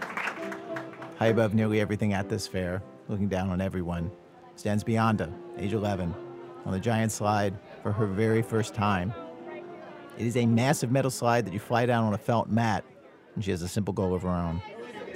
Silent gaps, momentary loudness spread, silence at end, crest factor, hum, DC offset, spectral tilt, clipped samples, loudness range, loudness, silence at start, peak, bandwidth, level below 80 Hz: none; 15 LU; 0 s; 20 dB; none; under 0.1%; -6.5 dB/octave; under 0.1%; 4 LU; -28 LUFS; 0 s; -8 dBFS; 16 kHz; -56 dBFS